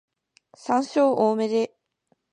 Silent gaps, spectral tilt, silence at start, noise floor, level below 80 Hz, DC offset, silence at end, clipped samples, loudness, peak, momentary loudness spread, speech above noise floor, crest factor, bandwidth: none; -5.5 dB/octave; 0.65 s; -70 dBFS; -78 dBFS; under 0.1%; 0.65 s; under 0.1%; -23 LUFS; -8 dBFS; 10 LU; 48 dB; 16 dB; 10 kHz